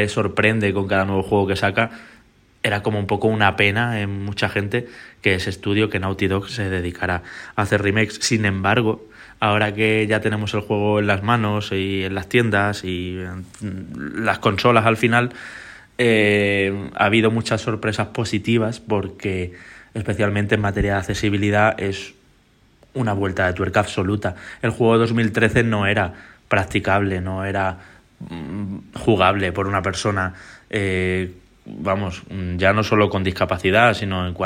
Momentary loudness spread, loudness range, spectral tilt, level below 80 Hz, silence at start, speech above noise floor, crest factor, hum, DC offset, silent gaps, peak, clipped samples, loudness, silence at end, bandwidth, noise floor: 12 LU; 3 LU; -5.5 dB/octave; -46 dBFS; 0 s; 36 dB; 18 dB; none; under 0.1%; none; -2 dBFS; under 0.1%; -20 LUFS; 0 s; 15 kHz; -56 dBFS